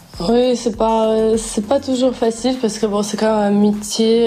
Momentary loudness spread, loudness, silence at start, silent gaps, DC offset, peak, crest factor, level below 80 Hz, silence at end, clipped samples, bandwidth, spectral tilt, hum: 4 LU; -17 LUFS; 0.15 s; none; under 0.1%; -4 dBFS; 12 dB; -42 dBFS; 0 s; under 0.1%; 14.5 kHz; -5 dB/octave; none